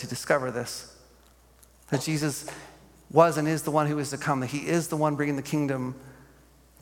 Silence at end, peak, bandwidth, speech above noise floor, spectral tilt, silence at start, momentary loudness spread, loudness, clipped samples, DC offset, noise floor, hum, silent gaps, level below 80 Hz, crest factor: 0.55 s; -6 dBFS; 17.5 kHz; 31 dB; -5.5 dB/octave; 0 s; 15 LU; -27 LUFS; under 0.1%; under 0.1%; -57 dBFS; none; none; -60 dBFS; 24 dB